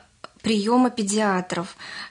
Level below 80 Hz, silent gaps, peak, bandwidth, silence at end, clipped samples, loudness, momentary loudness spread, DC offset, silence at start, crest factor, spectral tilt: -64 dBFS; none; -8 dBFS; 11 kHz; 0 s; under 0.1%; -23 LUFS; 12 LU; under 0.1%; 0.45 s; 14 dB; -4.5 dB/octave